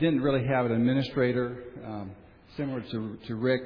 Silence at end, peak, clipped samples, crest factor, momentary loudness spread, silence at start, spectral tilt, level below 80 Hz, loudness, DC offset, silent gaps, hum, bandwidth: 0 s; -12 dBFS; under 0.1%; 16 dB; 15 LU; 0 s; -9.5 dB/octave; -58 dBFS; -29 LUFS; under 0.1%; none; none; 5.4 kHz